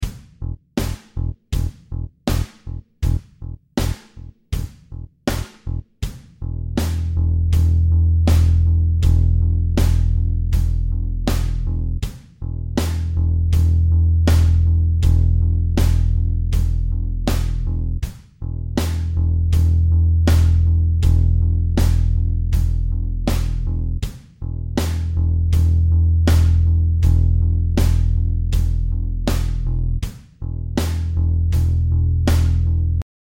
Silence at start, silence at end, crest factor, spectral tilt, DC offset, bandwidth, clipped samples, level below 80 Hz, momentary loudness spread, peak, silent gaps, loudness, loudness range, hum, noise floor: 0 s; 0.35 s; 12 dB; -7 dB/octave; 0.7%; 16 kHz; under 0.1%; -20 dBFS; 14 LU; -4 dBFS; none; -19 LUFS; 9 LU; none; -39 dBFS